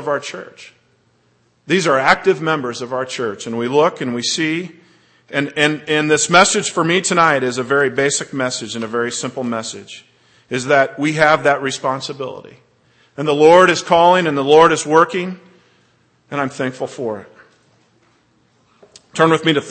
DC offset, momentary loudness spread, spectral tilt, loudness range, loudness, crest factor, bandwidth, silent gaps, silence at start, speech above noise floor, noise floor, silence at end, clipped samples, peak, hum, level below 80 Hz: under 0.1%; 16 LU; -3.5 dB/octave; 8 LU; -16 LUFS; 18 dB; 8.8 kHz; none; 0 s; 43 dB; -59 dBFS; 0 s; under 0.1%; 0 dBFS; none; -58 dBFS